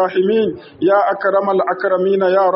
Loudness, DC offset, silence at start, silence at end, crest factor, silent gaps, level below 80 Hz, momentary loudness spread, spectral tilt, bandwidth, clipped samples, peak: -16 LUFS; under 0.1%; 0 s; 0 s; 12 dB; none; -62 dBFS; 4 LU; -4.5 dB/octave; 5.8 kHz; under 0.1%; -2 dBFS